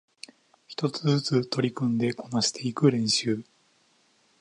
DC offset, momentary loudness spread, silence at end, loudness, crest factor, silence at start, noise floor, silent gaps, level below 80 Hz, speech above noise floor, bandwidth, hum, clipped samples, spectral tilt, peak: under 0.1%; 15 LU; 1 s; -26 LUFS; 20 dB; 0.7 s; -65 dBFS; none; -70 dBFS; 39 dB; 11.5 kHz; none; under 0.1%; -5 dB/octave; -8 dBFS